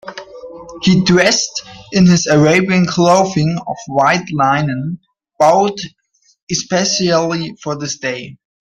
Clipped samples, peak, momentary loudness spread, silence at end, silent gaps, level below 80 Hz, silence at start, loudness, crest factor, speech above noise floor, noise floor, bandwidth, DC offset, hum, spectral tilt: under 0.1%; 0 dBFS; 18 LU; 0.3 s; 6.42-6.47 s; -48 dBFS; 0.05 s; -14 LUFS; 14 dB; 19 dB; -33 dBFS; 9.4 kHz; under 0.1%; none; -4.5 dB/octave